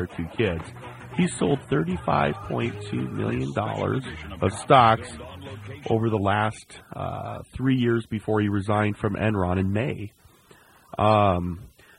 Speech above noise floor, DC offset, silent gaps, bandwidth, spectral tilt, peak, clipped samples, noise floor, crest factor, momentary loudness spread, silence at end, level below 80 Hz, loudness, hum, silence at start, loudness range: 30 dB; under 0.1%; none; 11.5 kHz; -6.5 dB/octave; -4 dBFS; under 0.1%; -54 dBFS; 22 dB; 17 LU; 0.3 s; -48 dBFS; -24 LUFS; none; 0 s; 3 LU